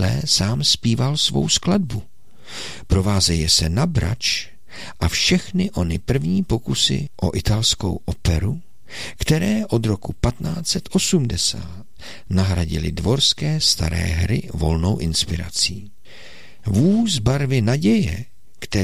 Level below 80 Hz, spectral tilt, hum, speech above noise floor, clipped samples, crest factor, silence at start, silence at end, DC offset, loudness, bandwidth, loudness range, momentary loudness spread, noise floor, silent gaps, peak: -34 dBFS; -4.5 dB/octave; none; 25 dB; under 0.1%; 16 dB; 0 s; 0 s; 2%; -19 LUFS; 16 kHz; 2 LU; 15 LU; -44 dBFS; none; -4 dBFS